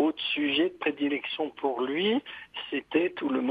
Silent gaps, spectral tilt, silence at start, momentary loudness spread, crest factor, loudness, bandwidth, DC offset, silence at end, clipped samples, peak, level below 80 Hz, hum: none; -6.5 dB/octave; 0 s; 8 LU; 16 dB; -29 LUFS; 5 kHz; under 0.1%; 0 s; under 0.1%; -12 dBFS; -72 dBFS; none